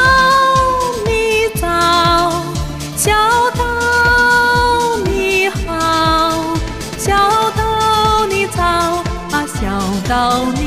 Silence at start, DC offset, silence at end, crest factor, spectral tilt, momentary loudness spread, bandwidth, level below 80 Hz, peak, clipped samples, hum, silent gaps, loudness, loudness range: 0 s; 0.3%; 0 s; 14 dB; -4 dB/octave; 9 LU; 16 kHz; -28 dBFS; 0 dBFS; under 0.1%; none; none; -13 LUFS; 2 LU